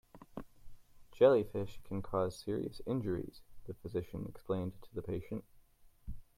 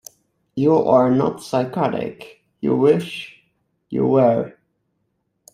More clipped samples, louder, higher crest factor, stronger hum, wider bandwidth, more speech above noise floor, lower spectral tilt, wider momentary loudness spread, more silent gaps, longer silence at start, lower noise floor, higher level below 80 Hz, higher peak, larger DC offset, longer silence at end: neither; second, -36 LUFS vs -19 LUFS; about the same, 22 dB vs 18 dB; neither; about the same, 15.5 kHz vs 14.5 kHz; second, 27 dB vs 53 dB; about the same, -8 dB/octave vs -7.5 dB/octave; first, 23 LU vs 16 LU; neither; second, 0.15 s vs 0.55 s; second, -63 dBFS vs -71 dBFS; about the same, -56 dBFS vs -60 dBFS; second, -14 dBFS vs -2 dBFS; neither; second, 0.15 s vs 1.05 s